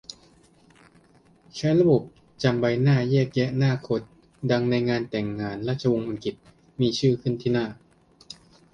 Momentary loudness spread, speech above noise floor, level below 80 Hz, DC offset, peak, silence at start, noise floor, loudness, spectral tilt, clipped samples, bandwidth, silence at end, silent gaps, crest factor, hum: 16 LU; 34 dB; -58 dBFS; under 0.1%; -6 dBFS; 0.1 s; -57 dBFS; -24 LUFS; -7 dB/octave; under 0.1%; 8.8 kHz; 0.4 s; none; 18 dB; none